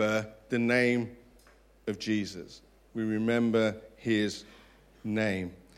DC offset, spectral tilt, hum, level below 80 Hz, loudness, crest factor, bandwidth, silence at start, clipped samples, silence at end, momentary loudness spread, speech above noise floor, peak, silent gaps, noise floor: under 0.1%; -5.5 dB/octave; none; -62 dBFS; -30 LUFS; 20 dB; 13 kHz; 0 s; under 0.1%; 0.25 s; 16 LU; 30 dB; -12 dBFS; none; -60 dBFS